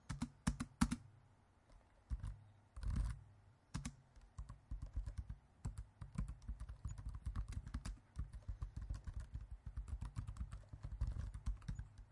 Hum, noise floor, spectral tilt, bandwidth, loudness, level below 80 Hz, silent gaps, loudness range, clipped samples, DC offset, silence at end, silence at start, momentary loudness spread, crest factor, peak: none; -70 dBFS; -5.5 dB/octave; 11.5 kHz; -50 LUFS; -50 dBFS; none; 5 LU; under 0.1%; under 0.1%; 0 s; 0.05 s; 13 LU; 28 dB; -20 dBFS